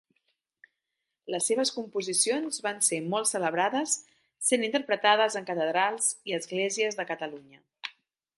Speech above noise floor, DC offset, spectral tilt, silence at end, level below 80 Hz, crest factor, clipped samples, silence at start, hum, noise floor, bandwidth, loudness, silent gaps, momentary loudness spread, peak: 57 dB; under 0.1%; -2 dB/octave; 0.5 s; -84 dBFS; 22 dB; under 0.1%; 1.25 s; none; -85 dBFS; 12 kHz; -27 LUFS; none; 12 LU; -8 dBFS